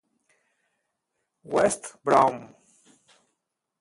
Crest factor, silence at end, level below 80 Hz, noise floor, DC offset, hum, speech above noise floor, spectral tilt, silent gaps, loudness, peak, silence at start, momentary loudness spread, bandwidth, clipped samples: 24 dB; 1.35 s; -66 dBFS; -81 dBFS; under 0.1%; none; 58 dB; -4.5 dB/octave; none; -24 LUFS; -6 dBFS; 1.5 s; 10 LU; 12 kHz; under 0.1%